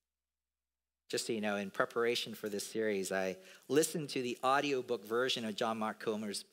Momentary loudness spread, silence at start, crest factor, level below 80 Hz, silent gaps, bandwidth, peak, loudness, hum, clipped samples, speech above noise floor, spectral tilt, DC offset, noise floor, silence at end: 7 LU; 1.1 s; 22 dB; under -90 dBFS; none; 16 kHz; -16 dBFS; -36 LUFS; 60 Hz at -70 dBFS; under 0.1%; over 54 dB; -3.5 dB/octave; under 0.1%; under -90 dBFS; 0.1 s